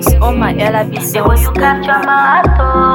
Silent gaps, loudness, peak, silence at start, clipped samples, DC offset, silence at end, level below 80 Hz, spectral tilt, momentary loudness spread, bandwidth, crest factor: none; -11 LUFS; 0 dBFS; 0 s; under 0.1%; under 0.1%; 0 s; -16 dBFS; -5.5 dB/octave; 4 LU; 18.5 kHz; 10 dB